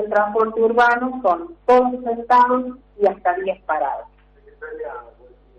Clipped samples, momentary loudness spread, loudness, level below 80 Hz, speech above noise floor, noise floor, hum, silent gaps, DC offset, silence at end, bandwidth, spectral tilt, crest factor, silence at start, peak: under 0.1%; 17 LU; -18 LUFS; -54 dBFS; 29 dB; -47 dBFS; 50 Hz at -55 dBFS; none; under 0.1%; 0.5 s; 8 kHz; -6 dB/octave; 14 dB; 0 s; -6 dBFS